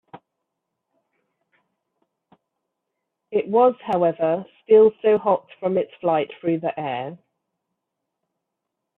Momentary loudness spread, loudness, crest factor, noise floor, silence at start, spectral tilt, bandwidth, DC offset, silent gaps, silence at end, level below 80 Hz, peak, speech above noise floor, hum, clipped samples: 13 LU; -21 LUFS; 18 dB; -81 dBFS; 0.15 s; -9 dB/octave; 4 kHz; under 0.1%; none; 1.85 s; -70 dBFS; -6 dBFS; 61 dB; none; under 0.1%